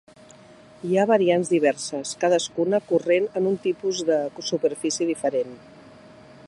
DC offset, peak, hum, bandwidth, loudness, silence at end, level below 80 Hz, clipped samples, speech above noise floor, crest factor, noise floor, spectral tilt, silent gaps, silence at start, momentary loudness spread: under 0.1%; -6 dBFS; none; 11.5 kHz; -23 LUFS; 0 s; -70 dBFS; under 0.1%; 26 dB; 18 dB; -49 dBFS; -4.5 dB/octave; none; 0.85 s; 8 LU